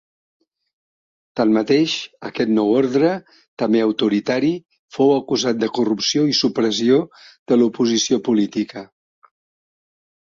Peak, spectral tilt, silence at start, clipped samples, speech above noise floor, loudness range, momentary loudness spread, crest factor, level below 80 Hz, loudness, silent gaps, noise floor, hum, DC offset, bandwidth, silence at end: -4 dBFS; -4.5 dB/octave; 1.35 s; under 0.1%; over 72 dB; 2 LU; 11 LU; 16 dB; -64 dBFS; -18 LUFS; 3.48-3.57 s, 4.79-4.88 s, 7.39-7.46 s; under -90 dBFS; none; under 0.1%; 7.6 kHz; 1.45 s